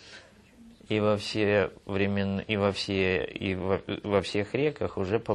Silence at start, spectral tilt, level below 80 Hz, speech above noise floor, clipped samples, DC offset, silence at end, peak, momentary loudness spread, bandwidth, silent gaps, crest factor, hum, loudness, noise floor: 0 s; -6 dB/octave; -58 dBFS; 26 dB; under 0.1%; under 0.1%; 0 s; -10 dBFS; 5 LU; 11.5 kHz; none; 20 dB; none; -28 LUFS; -54 dBFS